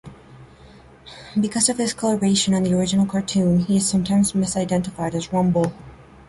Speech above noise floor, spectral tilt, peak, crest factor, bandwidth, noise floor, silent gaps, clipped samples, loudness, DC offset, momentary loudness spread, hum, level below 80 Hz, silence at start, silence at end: 26 dB; -5 dB/octave; -4 dBFS; 18 dB; 11.5 kHz; -46 dBFS; none; under 0.1%; -20 LUFS; under 0.1%; 6 LU; none; -48 dBFS; 0.05 s; 0.25 s